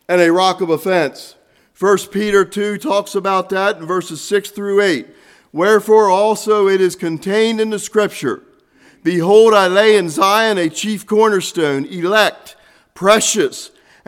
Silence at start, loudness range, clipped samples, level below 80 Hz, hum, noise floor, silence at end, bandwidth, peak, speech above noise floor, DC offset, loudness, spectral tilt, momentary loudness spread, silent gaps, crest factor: 0.1 s; 4 LU; under 0.1%; -60 dBFS; none; -50 dBFS; 0.4 s; 16.5 kHz; 0 dBFS; 36 dB; under 0.1%; -15 LUFS; -4 dB/octave; 10 LU; none; 14 dB